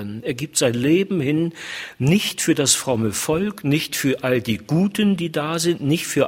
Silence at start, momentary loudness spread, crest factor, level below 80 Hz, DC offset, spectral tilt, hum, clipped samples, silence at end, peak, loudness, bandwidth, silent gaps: 0 s; 6 LU; 18 dB; -52 dBFS; under 0.1%; -4.5 dB/octave; none; under 0.1%; 0 s; -2 dBFS; -20 LUFS; 16.5 kHz; none